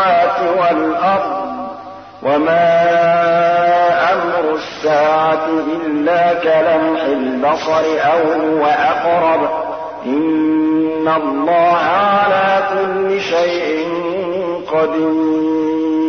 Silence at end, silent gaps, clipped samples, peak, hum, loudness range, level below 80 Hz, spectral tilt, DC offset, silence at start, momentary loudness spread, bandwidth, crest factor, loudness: 0 s; none; under 0.1%; -4 dBFS; none; 2 LU; -56 dBFS; -6 dB/octave; 0.1%; 0 s; 7 LU; 6.6 kHz; 10 dB; -14 LUFS